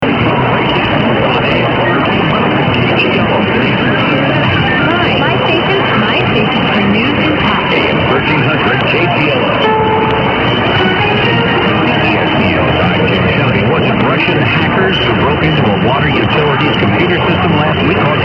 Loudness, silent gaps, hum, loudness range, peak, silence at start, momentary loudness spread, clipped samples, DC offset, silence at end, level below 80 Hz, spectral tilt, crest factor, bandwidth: -10 LUFS; none; none; 0 LU; 0 dBFS; 0 s; 1 LU; under 0.1%; under 0.1%; 0 s; -34 dBFS; -8 dB/octave; 10 dB; 6.2 kHz